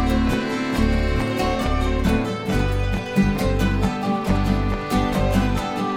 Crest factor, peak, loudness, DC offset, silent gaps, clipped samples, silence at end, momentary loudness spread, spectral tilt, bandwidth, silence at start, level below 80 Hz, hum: 16 dB; -4 dBFS; -22 LUFS; under 0.1%; none; under 0.1%; 0 s; 3 LU; -6.5 dB/octave; 17 kHz; 0 s; -26 dBFS; none